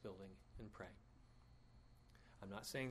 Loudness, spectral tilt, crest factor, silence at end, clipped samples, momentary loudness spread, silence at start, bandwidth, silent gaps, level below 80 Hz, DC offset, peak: -54 LUFS; -4.5 dB/octave; 24 dB; 0 s; under 0.1%; 20 LU; 0 s; 13 kHz; none; -68 dBFS; under 0.1%; -32 dBFS